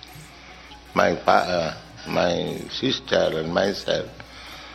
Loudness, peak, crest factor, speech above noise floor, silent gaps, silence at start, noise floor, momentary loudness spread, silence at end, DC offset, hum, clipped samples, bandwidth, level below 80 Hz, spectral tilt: -23 LUFS; -2 dBFS; 24 dB; 21 dB; none; 0 s; -44 dBFS; 22 LU; 0 s; under 0.1%; none; under 0.1%; 15.5 kHz; -50 dBFS; -4.5 dB/octave